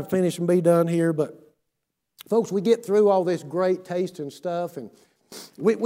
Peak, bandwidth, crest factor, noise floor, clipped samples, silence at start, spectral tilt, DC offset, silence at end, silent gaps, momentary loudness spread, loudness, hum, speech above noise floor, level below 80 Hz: -6 dBFS; 16 kHz; 16 dB; -79 dBFS; under 0.1%; 0 s; -7 dB/octave; under 0.1%; 0 s; none; 14 LU; -23 LUFS; none; 57 dB; -72 dBFS